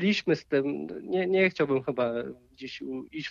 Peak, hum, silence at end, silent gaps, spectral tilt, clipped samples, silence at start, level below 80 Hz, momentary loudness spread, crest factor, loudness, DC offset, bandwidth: -12 dBFS; none; 0 s; none; -6.5 dB/octave; under 0.1%; 0 s; -66 dBFS; 15 LU; 16 dB; -28 LUFS; under 0.1%; 7.4 kHz